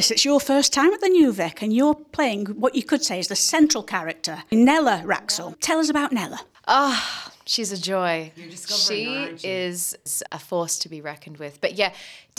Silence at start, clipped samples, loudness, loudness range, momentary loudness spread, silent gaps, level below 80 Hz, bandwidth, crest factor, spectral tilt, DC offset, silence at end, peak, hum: 0 s; under 0.1%; -21 LUFS; 5 LU; 12 LU; none; -64 dBFS; 18 kHz; 18 dB; -2.5 dB/octave; under 0.1%; 0.2 s; -4 dBFS; none